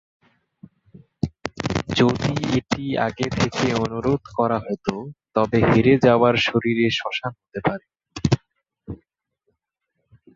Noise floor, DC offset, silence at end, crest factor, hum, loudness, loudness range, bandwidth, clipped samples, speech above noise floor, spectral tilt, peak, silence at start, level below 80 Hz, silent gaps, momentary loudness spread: -77 dBFS; under 0.1%; 1.4 s; 20 dB; none; -21 LUFS; 6 LU; 7.8 kHz; under 0.1%; 57 dB; -6 dB/octave; -2 dBFS; 0.95 s; -46 dBFS; none; 14 LU